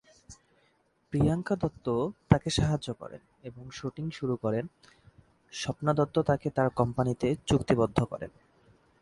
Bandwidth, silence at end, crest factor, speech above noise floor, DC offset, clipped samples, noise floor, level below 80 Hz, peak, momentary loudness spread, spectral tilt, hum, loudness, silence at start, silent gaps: 11.5 kHz; 0.7 s; 26 dB; 41 dB; under 0.1%; under 0.1%; -70 dBFS; -50 dBFS; -4 dBFS; 17 LU; -6.5 dB/octave; none; -29 LUFS; 0.3 s; none